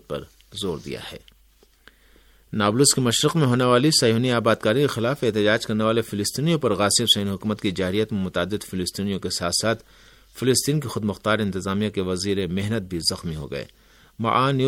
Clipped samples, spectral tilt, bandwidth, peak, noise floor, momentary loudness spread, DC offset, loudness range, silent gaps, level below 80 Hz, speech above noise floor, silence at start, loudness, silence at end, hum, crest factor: under 0.1%; -4 dB/octave; 17 kHz; -4 dBFS; -57 dBFS; 13 LU; under 0.1%; 6 LU; none; -52 dBFS; 35 dB; 0.1 s; -22 LUFS; 0 s; none; 20 dB